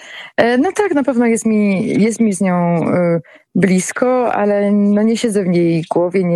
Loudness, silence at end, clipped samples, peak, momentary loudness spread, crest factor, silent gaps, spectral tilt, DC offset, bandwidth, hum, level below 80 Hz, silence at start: -15 LUFS; 0 s; under 0.1%; 0 dBFS; 3 LU; 14 dB; none; -6.5 dB/octave; under 0.1%; 12.5 kHz; none; -58 dBFS; 0 s